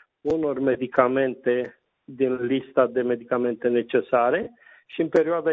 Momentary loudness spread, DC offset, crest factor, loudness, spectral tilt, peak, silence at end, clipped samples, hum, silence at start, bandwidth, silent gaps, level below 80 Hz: 6 LU; under 0.1%; 20 dB; -23 LUFS; -8 dB/octave; -2 dBFS; 0 s; under 0.1%; none; 0.25 s; 7 kHz; none; -64 dBFS